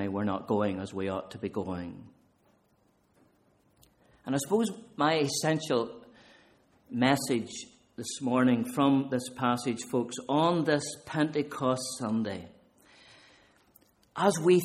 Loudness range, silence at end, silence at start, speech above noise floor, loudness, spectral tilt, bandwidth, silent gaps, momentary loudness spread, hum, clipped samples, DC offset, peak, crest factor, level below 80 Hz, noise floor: 8 LU; 0 s; 0 s; 40 dB; -30 LUFS; -5 dB/octave; 15.5 kHz; none; 13 LU; none; under 0.1%; under 0.1%; -10 dBFS; 22 dB; -68 dBFS; -68 dBFS